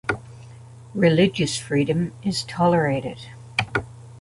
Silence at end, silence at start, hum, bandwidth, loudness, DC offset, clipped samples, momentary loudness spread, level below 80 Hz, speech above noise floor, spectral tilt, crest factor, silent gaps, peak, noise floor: 0 s; 0.05 s; none; 11.5 kHz; -22 LUFS; under 0.1%; under 0.1%; 16 LU; -50 dBFS; 22 dB; -5.5 dB/octave; 18 dB; none; -4 dBFS; -43 dBFS